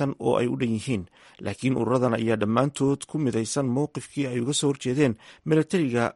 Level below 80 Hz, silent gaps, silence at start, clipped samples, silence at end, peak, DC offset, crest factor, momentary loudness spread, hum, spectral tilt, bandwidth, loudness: -60 dBFS; none; 0 s; under 0.1%; 0.05 s; -8 dBFS; under 0.1%; 18 dB; 7 LU; none; -5.5 dB/octave; 11.5 kHz; -25 LUFS